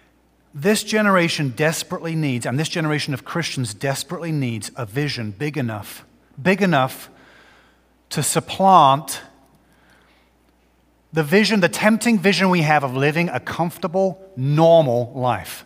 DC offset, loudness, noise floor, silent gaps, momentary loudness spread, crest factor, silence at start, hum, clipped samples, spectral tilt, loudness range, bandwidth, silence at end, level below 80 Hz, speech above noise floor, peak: under 0.1%; -19 LUFS; -59 dBFS; none; 12 LU; 20 dB; 0.55 s; none; under 0.1%; -5 dB/octave; 6 LU; 16 kHz; 0.05 s; -60 dBFS; 40 dB; 0 dBFS